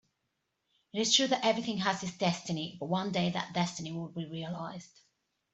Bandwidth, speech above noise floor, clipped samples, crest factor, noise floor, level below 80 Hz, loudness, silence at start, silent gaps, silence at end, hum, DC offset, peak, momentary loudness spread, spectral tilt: 8.2 kHz; 50 dB; under 0.1%; 22 dB; -82 dBFS; -72 dBFS; -32 LUFS; 0.95 s; none; 0.65 s; none; under 0.1%; -12 dBFS; 14 LU; -3.5 dB/octave